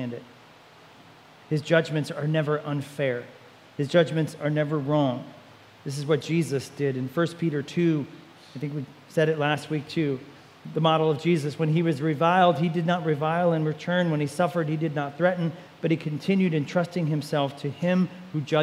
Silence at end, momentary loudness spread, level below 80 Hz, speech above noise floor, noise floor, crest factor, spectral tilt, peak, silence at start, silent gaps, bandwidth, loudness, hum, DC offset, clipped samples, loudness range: 0 s; 11 LU; -74 dBFS; 26 dB; -51 dBFS; 20 dB; -7 dB/octave; -6 dBFS; 0 s; none; 14 kHz; -26 LUFS; none; under 0.1%; under 0.1%; 4 LU